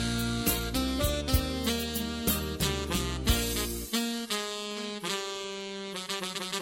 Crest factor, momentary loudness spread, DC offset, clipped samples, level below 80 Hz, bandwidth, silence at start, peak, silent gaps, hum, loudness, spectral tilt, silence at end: 20 dB; 7 LU; under 0.1%; under 0.1%; -38 dBFS; 17 kHz; 0 s; -10 dBFS; none; none; -31 LUFS; -3.5 dB/octave; 0 s